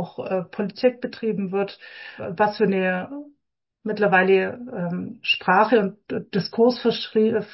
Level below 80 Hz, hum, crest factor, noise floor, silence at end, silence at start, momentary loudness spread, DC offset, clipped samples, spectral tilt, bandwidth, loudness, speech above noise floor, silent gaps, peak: -66 dBFS; none; 16 dB; -77 dBFS; 0.05 s; 0 s; 15 LU; under 0.1%; under 0.1%; -9.5 dB/octave; 5.8 kHz; -22 LUFS; 55 dB; none; -6 dBFS